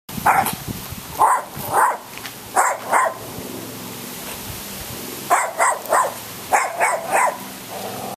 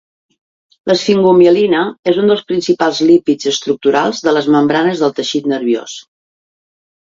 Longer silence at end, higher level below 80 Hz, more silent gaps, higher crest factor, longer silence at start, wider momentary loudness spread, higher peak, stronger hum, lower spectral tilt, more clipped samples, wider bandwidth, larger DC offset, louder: second, 0 s vs 1 s; first, -50 dBFS vs -58 dBFS; second, none vs 1.99-2.03 s; first, 20 dB vs 14 dB; second, 0.1 s vs 0.85 s; first, 13 LU vs 8 LU; about the same, -2 dBFS vs 0 dBFS; neither; second, -2.5 dB/octave vs -5 dB/octave; neither; first, 15 kHz vs 7.8 kHz; neither; second, -21 LUFS vs -13 LUFS